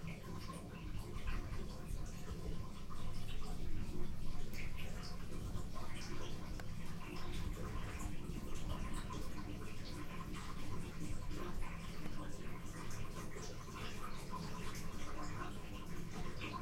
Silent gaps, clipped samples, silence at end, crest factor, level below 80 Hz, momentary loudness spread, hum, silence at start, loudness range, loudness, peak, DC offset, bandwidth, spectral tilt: none; under 0.1%; 0 s; 14 dB; -46 dBFS; 3 LU; none; 0 s; 1 LU; -48 LUFS; -26 dBFS; under 0.1%; 15 kHz; -5 dB/octave